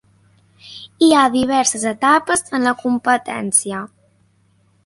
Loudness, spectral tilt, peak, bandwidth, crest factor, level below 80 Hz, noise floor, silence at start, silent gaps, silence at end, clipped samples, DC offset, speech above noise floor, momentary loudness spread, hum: -16 LUFS; -2.5 dB/octave; 0 dBFS; 11.5 kHz; 18 dB; -56 dBFS; -58 dBFS; 0.65 s; none; 1 s; under 0.1%; under 0.1%; 42 dB; 20 LU; none